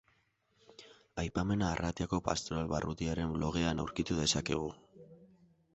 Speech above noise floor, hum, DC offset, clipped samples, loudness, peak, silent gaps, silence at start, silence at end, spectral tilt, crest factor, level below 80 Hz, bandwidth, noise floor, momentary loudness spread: 40 dB; none; under 0.1%; under 0.1%; -35 LUFS; -14 dBFS; none; 0.8 s; 0.5 s; -5 dB/octave; 24 dB; -50 dBFS; 8 kHz; -74 dBFS; 12 LU